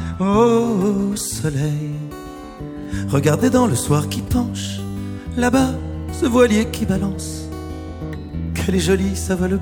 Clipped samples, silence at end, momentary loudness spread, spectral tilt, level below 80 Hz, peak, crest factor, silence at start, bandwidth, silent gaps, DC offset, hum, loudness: under 0.1%; 0 s; 15 LU; -6 dB/octave; -34 dBFS; -2 dBFS; 18 dB; 0 s; 18.5 kHz; none; under 0.1%; none; -19 LUFS